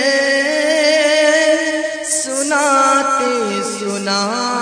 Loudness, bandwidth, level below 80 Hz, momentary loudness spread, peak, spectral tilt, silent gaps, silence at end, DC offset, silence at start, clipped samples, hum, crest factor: -14 LUFS; 10.5 kHz; -64 dBFS; 7 LU; -2 dBFS; -2 dB/octave; none; 0 s; under 0.1%; 0 s; under 0.1%; none; 14 dB